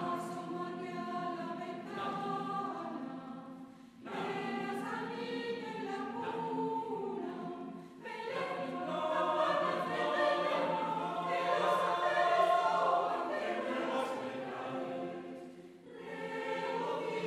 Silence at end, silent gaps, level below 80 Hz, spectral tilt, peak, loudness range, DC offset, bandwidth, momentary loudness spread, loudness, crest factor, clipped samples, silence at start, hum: 0 s; none; -80 dBFS; -5 dB/octave; -16 dBFS; 9 LU; under 0.1%; 14 kHz; 15 LU; -36 LUFS; 20 dB; under 0.1%; 0 s; none